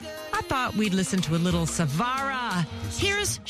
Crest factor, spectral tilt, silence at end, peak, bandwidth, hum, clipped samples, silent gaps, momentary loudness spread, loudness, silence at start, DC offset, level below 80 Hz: 14 dB; -4 dB/octave; 0 s; -12 dBFS; 14.5 kHz; none; under 0.1%; none; 5 LU; -26 LUFS; 0 s; under 0.1%; -46 dBFS